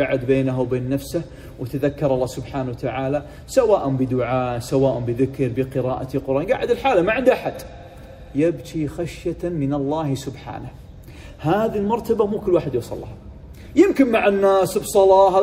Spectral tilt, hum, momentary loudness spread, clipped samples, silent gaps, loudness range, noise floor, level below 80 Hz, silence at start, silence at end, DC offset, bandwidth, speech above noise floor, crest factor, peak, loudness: -6.5 dB/octave; none; 17 LU; under 0.1%; none; 6 LU; -39 dBFS; -44 dBFS; 0 s; 0 s; under 0.1%; 16 kHz; 20 dB; 18 dB; -2 dBFS; -20 LUFS